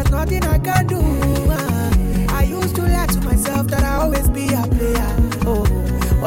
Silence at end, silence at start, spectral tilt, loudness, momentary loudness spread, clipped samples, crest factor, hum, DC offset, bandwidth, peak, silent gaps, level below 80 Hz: 0 s; 0 s; -6 dB/octave; -18 LUFS; 2 LU; under 0.1%; 14 dB; none; under 0.1%; 17 kHz; -2 dBFS; none; -20 dBFS